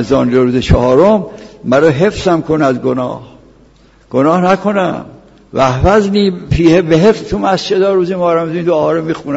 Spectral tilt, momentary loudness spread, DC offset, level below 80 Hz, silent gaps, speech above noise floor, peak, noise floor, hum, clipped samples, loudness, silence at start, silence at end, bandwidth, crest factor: -7 dB/octave; 9 LU; under 0.1%; -28 dBFS; none; 34 dB; 0 dBFS; -45 dBFS; none; under 0.1%; -12 LUFS; 0 s; 0 s; 8 kHz; 12 dB